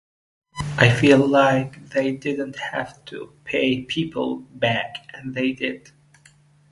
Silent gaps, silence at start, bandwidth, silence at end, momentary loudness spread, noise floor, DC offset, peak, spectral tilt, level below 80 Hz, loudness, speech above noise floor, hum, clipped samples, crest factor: none; 0.55 s; 11.5 kHz; 0.95 s; 19 LU; -54 dBFS; under 0.1%; 0 dBFS; -6 dB/octave; -52 dBFS; -21 LUFS; 33 dB; none; under 0.1%; 22 dB